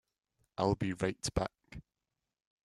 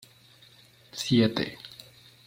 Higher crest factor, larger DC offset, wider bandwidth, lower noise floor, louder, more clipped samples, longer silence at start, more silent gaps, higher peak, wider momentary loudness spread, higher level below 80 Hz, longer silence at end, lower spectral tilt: about the same, 24 dB vs 22 dB; neither; second, 13 kHz vs 16.5 kHz; first, -89 dBFS vs -56 dBFS; second, -35 LUFS vs -26 LUFS; neither; second, 0.6 s vs 0.95 s; neither; second, -14 dBFS vs -10 dBFS; about the same, 21 LU vs 21 LU; first, -54 dBFS vs -64 dBFS; first, 0.85 s vs 0.6 s; about the same, -5.5 dB/octave vs -5.5 dB/octave